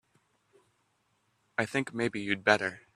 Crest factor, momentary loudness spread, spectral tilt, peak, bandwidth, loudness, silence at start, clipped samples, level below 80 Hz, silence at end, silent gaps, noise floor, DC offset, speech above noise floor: 26 dB; 8 LU; -4.5 dB/octave; -6 dBFS; 13.5 kHz; -30 LUFS; 1.6 s; under 0.1%; -72 dBFS; 0.2 s; none; -74 dBFS; under 0.1%; 44 dB